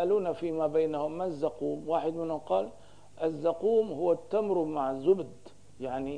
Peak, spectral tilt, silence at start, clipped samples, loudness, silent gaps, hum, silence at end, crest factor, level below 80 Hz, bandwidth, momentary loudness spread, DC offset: -14 dBFS; -7.5 dB/octave; 0 s; under 0.1%; -30 LUFS; none; none; 0 s; 16 dB; -66 dBFS; 10 kHz; 8 LU; 0.3%